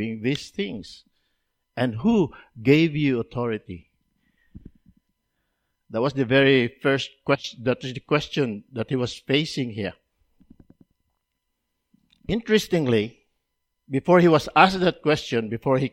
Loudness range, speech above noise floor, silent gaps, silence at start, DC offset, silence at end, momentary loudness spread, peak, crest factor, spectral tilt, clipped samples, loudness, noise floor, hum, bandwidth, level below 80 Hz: 9 LU; 56 dB; none; 0 s; under 0.1%; 0.05 s; 15 LU; 0 dBFS; 24 dB; -6 dB/octave; under 0.1%; -23 LUFS; -78 dBFS; none; 15.5 kHz; -54 dBFS